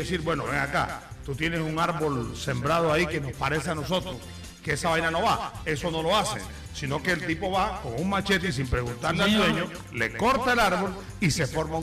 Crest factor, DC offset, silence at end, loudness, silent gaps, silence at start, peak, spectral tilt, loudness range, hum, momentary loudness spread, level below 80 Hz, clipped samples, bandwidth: 14 dB; under 0.1%; 0 s; -26 LUFS; none; 0 s; -12 dBFS; -4.5 dB/octave; 3 LU; none; 9 LU; -44 dBFS; under 0.1%; 15.5 kHz